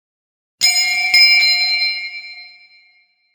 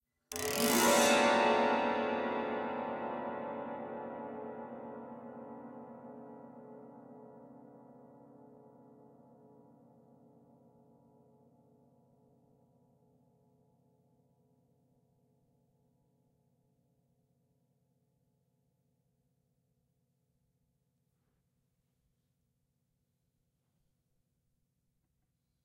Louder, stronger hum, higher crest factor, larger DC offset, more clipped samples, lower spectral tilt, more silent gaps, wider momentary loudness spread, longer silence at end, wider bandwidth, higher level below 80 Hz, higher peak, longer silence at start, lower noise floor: first, -11 LUFS vs -32 LUFS; neither; second, 16 dB vs 26 dB; neither; neither; second, 4 dB/octave vs -2.5 dB/octave; neither; second, 19 LU vs 27 LU; second, 0.85 s vs 17.05 s; first, 18 kHz vs 16 kHz; first, -70 dBFS vs -80 dBFS; first, 0 dBFS vs -14 dBFS; first, 0.6 s vs 0.3 s; second, -56 dBFS vs -81 dBFS